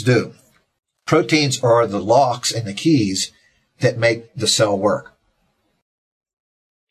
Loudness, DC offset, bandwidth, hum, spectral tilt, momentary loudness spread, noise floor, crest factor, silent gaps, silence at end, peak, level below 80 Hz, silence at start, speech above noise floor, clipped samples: -18 LUFS; under 0.1%; 14 kHz; none; -4.5 dB/octave; 7 LU; -66 dBFS; 18 dB; none; 1.9 s; -2 dBFS; -54 dBFS; 0 s; 49 dB; under 0.1%